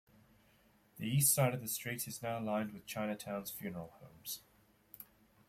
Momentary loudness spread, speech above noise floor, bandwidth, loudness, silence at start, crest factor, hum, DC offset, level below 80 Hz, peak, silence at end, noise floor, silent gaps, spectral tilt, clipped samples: 24 LU; 31 dB; 16.5 kHz; -37 LUFS; 0.95 s; 22 dB; none; under 0.1%; -72 dBFS; -18 dBFS; 0.45 s; -69 dBFS; none; -4 dB/octave; under 0.1%